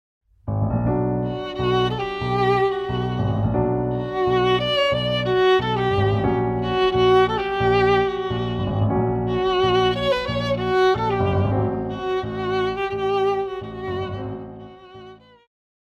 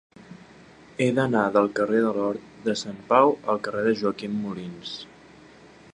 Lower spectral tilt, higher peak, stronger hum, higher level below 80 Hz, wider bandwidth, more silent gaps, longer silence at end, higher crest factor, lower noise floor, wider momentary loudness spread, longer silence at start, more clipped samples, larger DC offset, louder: first, -7.5 dB/octave vs -6 dB/octave; second, -8 dBFS vs -4 dBFS; neither; first, -40 dBFS vs -64 dBFS; second, 7.2 kHz vs 10.5 kHz; neither; about the same, 0.8 s vs 0.9 s; second, 14 dB vs 22 dB; second, -44 dBFS vs -50 dBFS; second, 9 LU vs 15 LU; first, 0.45 s vs 0.3 s; neither; neither; first, -21 LUFS vs -24 LUFS